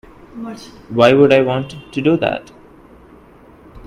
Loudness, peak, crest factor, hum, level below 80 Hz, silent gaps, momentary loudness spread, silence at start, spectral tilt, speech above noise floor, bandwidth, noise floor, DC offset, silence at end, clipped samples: -15 LUFS; 0 dBFS; 18 dB; none; -48 dBFS; none; 21 LU; 0.35 s; -7 dB/octave; 29 dB; 11.5 kHz; -44 dBFS; under 0.1%; 0.1 s; under 0.1%